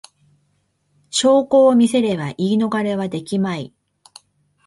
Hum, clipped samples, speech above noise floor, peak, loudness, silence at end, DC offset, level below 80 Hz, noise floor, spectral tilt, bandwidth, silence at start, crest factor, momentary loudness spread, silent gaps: none; under 0.1%; 49 dB; -4 dBFS; -17 LUFS; 1 s; under 0.1%; -62 dBFS; -66 dBFS; -5 dB/octave; 11.5 kHz; 1.15 s; 16 dB; 11 LU; none